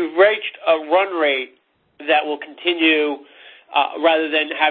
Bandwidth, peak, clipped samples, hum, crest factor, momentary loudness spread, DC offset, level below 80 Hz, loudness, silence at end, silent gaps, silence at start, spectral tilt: 4.6 kHz; -2 dBFS; under 0.1%; none; 18 dB; 9 LU; under 0.1%; -68 dBFS; -18 LUFS; 0 s; none; 0 s; -7 dB/octave